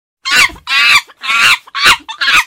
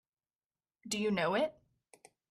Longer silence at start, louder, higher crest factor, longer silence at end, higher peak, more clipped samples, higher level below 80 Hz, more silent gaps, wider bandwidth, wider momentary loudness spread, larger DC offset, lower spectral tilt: second, 0.25 s vs 0.85 s; first, -9 LUFS vs -34 LUFS; about the same, 12 dB vs 16 dB; second, 0 s vs 0.8 s; first, 0 dBFS vs -22 dBFS; first, 0.4% vs under 0.1%; first, -44 dBFS vs -76 dBFS; neither; first, over 20 kHz vs 14 kHz; second, 5 LU vs 10 LU; neither; second, 1 dB/octave vs -4 dB/octave